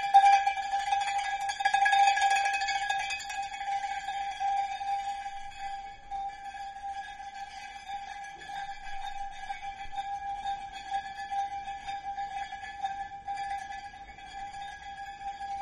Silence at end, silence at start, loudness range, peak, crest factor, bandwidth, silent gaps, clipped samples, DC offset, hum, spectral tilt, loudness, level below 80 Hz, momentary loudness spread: 0 s; 0 s; 12 LU; -10 dBFS; 22 dB; 11.5 kHz; none; under 0.1%; under 0.1%; none; 0 dB/octave; -32 LUFS; -56 dBFS; 17 LU